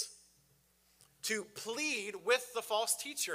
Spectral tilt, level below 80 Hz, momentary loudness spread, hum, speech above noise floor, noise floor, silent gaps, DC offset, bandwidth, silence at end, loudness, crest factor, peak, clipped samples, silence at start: -0.5 dB/octave; -82 dBFS; 9 LU; none; 34 dB; -71 dBFS; none; under 0.1%; 16 kHz; 0 s; -35 LUFS; 24 dB; -14 dBFS; under 0.1%; 0 s